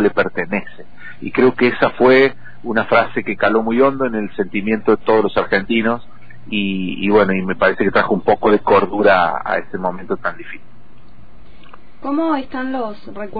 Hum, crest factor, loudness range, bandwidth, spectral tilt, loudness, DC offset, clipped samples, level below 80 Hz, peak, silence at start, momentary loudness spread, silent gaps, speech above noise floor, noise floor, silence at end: none; 16 dB; 9 LU; 5 kHz; -8.5 dB/octave; -16 LUFS; 4%; under 0.1%; -48 dBFS; -2 dBFS; 0 s; 12 LU; none; 29 dB; -46 dBFS; 0 s